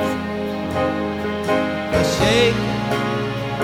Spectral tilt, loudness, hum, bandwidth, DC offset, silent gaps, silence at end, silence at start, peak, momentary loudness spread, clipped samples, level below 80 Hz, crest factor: -5 dB/octave; -20 LUFS; none; 17 kHz; under 0.1%; none; 0 s; 0 s; -4 dBFS; 8 LU; under 0.1%; -40 dBFS; 16 dB